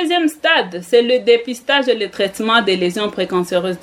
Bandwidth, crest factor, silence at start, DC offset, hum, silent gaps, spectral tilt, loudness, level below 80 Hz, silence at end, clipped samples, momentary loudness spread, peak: 15.5 kHz; 16 dB; 0 s; under 0.1%; none; none; -4 dB/octave; -16 LUFS; -60 dBFS; 0.05 s; under 0.1%; 6 LU; 0 dBFS